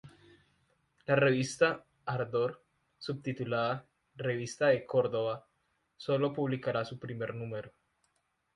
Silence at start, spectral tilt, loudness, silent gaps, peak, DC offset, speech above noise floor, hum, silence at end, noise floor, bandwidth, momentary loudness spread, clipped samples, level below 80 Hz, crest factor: 0.05 s; -6 dB/octave; -33 LUFS; none; -12 dBFS; under 0.1%; 46 dB; none; 0.85 s; -78 dBFS; 11.5 kHz; 13 LU; under 0.1%; -72 dBFS; 22 dB